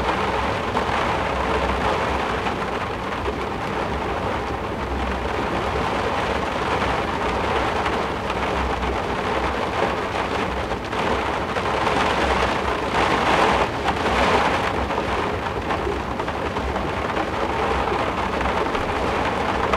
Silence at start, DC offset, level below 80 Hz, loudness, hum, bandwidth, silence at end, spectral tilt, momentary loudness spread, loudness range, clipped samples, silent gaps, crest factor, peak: 0 s; under 0.1%; -34 dBFS; -22 LUFS; none; 15.5 kHz; 0 s; -5 dB/octave; 6 LU; 4 LU; under 0.1%; none; 18 dB; -4 dBFS